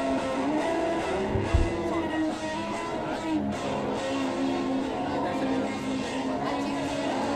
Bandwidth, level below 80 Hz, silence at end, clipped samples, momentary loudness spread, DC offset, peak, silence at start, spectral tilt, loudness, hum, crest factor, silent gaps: 12 kHz; -40 dBFS; 0 s; under 0.1%; 4 LU; under 0.1%; -10 dBFS; 0 s; -6 dB/octave; -29 LUFS; none; 18 dB; none